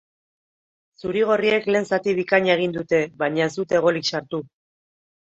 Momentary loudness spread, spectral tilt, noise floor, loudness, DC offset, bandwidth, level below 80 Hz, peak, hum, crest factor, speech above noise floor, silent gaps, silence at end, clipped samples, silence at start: 9 LU; -5 dB/octave; under -90 dBFS; -21 LUFS; under 0.1%; 8 kHz; -62 dBFS; -4 dBFS; none; 18 dB; over 69 dB; none; 0.75 s; under 0.1%; 1.05 s